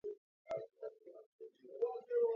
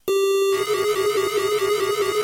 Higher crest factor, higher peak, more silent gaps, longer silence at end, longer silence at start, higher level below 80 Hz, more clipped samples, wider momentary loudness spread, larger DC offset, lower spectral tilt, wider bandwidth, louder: first, 16 dB vs 10 dB; second, -26 dBFS vs -10 dBFS; first, 0.18-0.45 s, 1.26-1.39 s vs none; about the same, 0 s vs 0 s; about the same, 0.05 s vs 0.05 s; second, -88 dBFS vs -60 dBFS; neither; first, 20 LU vs 2 LU; neither; first, -4.5 dB/octave vs -2.5 dB/octave; second, 5.8 kHz vs 17 kHz; second, -43 LUFS vs -21 LUFS